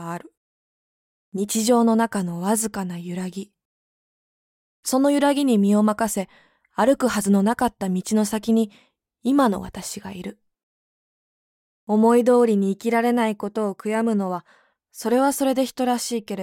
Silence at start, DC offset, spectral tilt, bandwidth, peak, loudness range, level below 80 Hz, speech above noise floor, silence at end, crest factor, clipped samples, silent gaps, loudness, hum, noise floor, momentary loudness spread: 0 s; under 0.1%; -5 dB/octave; 17 kHz; -6 dBFS; 4 LU; -60 dBFS; over 69 dB; 0 s; 16 dB; under 0.1%; 0.37-1.32 s, 3.65-4.83 s, 10.63-11.87 s; -21 LUFS; none; under -90 dBFS; 14 LU